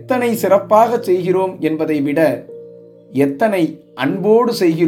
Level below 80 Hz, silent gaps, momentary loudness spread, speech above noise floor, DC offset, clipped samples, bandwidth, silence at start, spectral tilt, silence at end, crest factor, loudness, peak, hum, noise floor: -66 dBFS; none; 9 LU; 24 dB; under 0.1%; under 0.1%; 17 kHz; 0 s; -6.5 dB/octave; 0 s; 16 dB; -16 LUFS; 0 dBFS; none; -39 dBFS